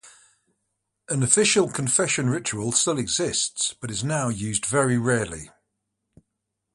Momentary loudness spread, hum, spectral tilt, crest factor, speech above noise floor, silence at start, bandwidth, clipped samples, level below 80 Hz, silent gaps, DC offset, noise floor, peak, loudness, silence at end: 8 LU; none; -3.5 dB/octave; 22 dB; 57 dB; 0.05 s; 11.5 kHz; under 0.1%; -56 dBFS; none; under 0.1%; -81 dBFS; -4 dBFS; -22 LUFS; 1.25 s